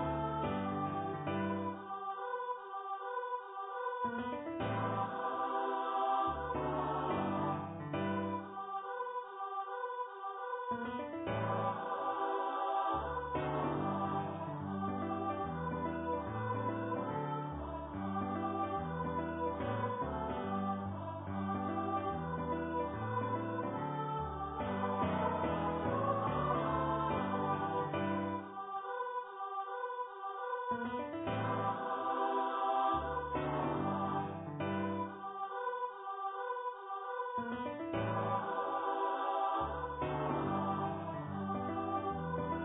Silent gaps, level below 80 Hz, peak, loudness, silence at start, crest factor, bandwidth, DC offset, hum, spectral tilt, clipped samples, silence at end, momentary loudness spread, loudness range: none; -58 dBFS; -22 dBFS; -38 LUFS; 0 s; 16 dB; 3.8 kHz; under 0.1%; none; -3.5 dB/octave; under 0.1%; 0 s; 7 LU; 4 LU